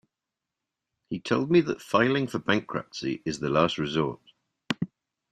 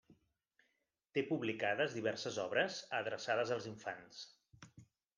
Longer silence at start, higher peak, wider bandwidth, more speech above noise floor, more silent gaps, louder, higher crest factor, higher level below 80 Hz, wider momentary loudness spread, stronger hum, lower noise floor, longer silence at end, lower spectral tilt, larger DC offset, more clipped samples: first, 1.1 s vs 0.1 s; first, -6 dBFS vs -22 dBFS; first, 13.5 kHz vs 10 kHz; first, 61 dB vs 45 dB; neither; first, -27 LUFS vs -39 LUFS; about the same, 22 dB vs 18 dB; first, -62 dBFS vs -84 dBFS; about the same, 12 LU vs 12 LU; neither; about the same, -87 dBFS vs -84 dBFS; about the same, 0.45 s vs 0.35 s; first, -6 dB/octave vs -4 dB/octave; neither; neither